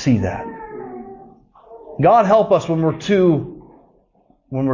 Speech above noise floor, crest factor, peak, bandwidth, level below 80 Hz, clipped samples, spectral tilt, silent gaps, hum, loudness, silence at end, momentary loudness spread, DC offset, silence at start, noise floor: 43 dB; 14 dB; -4 dBFS; 7.4 kHz; -46 dBFS; under 0.1%; -7.5 dB/octave; none; none; -16 LUFS; 0 s; 21 LU; under 0.1%; 0 s; -58 dBFS